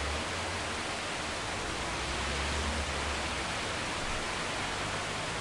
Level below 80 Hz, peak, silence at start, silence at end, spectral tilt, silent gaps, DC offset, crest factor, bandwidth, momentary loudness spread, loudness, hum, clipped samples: -44 dBFS; -20 dBFS; 0 s; 0 s; -3 dB/octave; none; under 0.1%; 14 dB; 11.5 kHz; 2 LU; -33 LUFS; none; under 0.1%